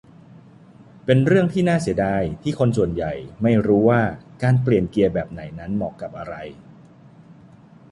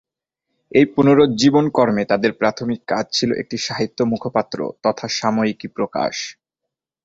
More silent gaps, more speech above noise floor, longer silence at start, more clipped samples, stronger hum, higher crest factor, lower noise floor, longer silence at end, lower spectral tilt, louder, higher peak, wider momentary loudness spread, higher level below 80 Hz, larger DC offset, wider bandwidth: neither; second, 27 dB vs 65 dB; first, 1.05 s vs 0.75 s; neither; neither; about the same, 18 dB vs 18 dB; second, -47 dBFS vs -83 dBFS; about the same, 0.6 s vs 0.7 s; first, -8 dB/octave vs -5 dB/octave; about the same, -20 LUFS vs -19 LUFS; about the same, -2 dBFS vs -2 dBFS; first, 16 LU vs 10 LU; first, -46 dBFS vs -56 dBFS; neither; first, 11.5 kHz vs 7.8 kHz